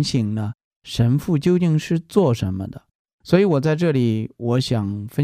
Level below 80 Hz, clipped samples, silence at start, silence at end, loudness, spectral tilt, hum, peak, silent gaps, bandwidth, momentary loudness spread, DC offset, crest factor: -50 dBFS; under 0.1%; 0 s; 0 s; -20 LUFS; -7 dB/octave; none; -2 dBFS; 0.64-0.82 s, 2.95-3.05 s, 3.13-3.19 s; 15 kHz; 10 LU; under 0.1%; 18 dB